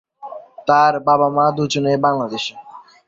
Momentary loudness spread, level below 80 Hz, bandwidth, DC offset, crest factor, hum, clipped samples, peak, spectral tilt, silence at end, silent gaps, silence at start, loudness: 18 LU; -62 dBFS; 7.8 kHz; under 0.1%; 16 dB; none; under 0.1%; -2 dBFS; -5 dB/octave; 0.25 s; none; 0.2 s; -17 LUFS